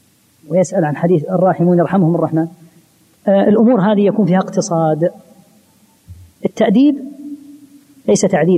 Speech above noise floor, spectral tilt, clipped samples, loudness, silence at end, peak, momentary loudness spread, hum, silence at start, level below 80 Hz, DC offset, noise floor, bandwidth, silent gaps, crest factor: 39 dB; -7 dB/octave; under 0.1%; -14 LUFS; 0 s; -2 dBFS; 13 LU; none; 0.5 s; -58 dBFS; under 0.1%; -52 dBFS; 11.5 kHz; none; 14 dB